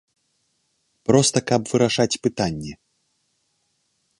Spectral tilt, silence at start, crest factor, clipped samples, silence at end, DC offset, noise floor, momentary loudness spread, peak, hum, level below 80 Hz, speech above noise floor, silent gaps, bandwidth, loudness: -4.5 dB/octave; 1.1 s; 22 dB; under 0.1%; 1.45 s; under 0.1%; -70 dBFS; 13 LU; 0 dBFS; none; -54 dBFS; 50 dB; none; 11.5 kHz; -21 LUFS